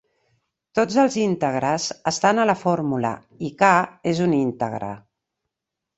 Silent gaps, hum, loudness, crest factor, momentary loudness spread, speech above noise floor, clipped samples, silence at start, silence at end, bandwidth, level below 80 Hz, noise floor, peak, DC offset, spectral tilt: none; none; -21 LUFS; 20 dB; 12 LU; 63 dB; under 0.1%; 0.75 s; 1 s; 8.2 kHz; -62 dBFS; -84 dBFS; -2 dBFS; under 0.1%; -5 dB/octave